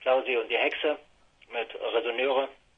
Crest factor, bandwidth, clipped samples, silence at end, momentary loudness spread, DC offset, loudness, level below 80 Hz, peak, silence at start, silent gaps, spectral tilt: 16 dB; 6.2 kHz; under 0.1%; 0.25 s; 10 LU; under 0.1%; -28 LUFS; -70 dBFS; -12 dBFS; 0 s; none; -4 dB/octave